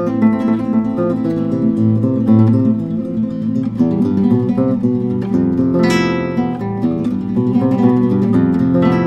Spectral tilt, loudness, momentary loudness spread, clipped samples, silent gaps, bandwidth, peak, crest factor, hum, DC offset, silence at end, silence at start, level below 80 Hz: -8.5 dB/octave; -15 LUFS; 6 LU; under 0.1%; none; 8.4 kHz; 0 dBFS; 14 dB; none; under 0.1%; 0 s; 0 s; -44 dBFS